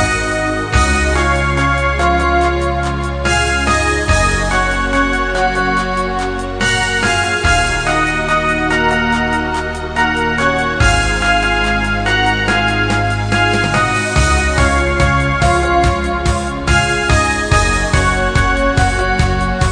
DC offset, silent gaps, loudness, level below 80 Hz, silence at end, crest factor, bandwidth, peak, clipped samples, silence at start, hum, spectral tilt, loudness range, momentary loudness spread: 0.3%; none; -14 LUFS; -22 dBFS; 0 s; 14 dB; 10 kHz; 0 dBFS; under 0.1%; 0 s; none; -4.5 dB/octave; 1 LU; 4 LU